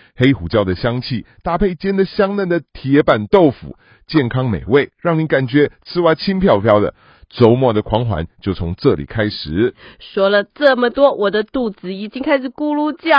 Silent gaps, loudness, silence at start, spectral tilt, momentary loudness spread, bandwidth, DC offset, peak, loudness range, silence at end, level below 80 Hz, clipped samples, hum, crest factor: none; -16 LUFS; 0.2 s; -9 dB/octave; 9 LU; 5.4 kHz; under 0.1%; 0 dBFS; 2 LU; 0 s; -38 dBFS; under 0.1%; none; 16 dB